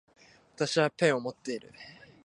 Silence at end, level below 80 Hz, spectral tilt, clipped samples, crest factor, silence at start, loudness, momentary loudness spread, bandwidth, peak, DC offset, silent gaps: 0.35 s; -74 dBFS; -4.5 dB/octave; under 0.1%; 22 dB; 0.6 s; -30 LUFS; 23 LU; 11 kHz; -10 dBFS; under 0.1%; none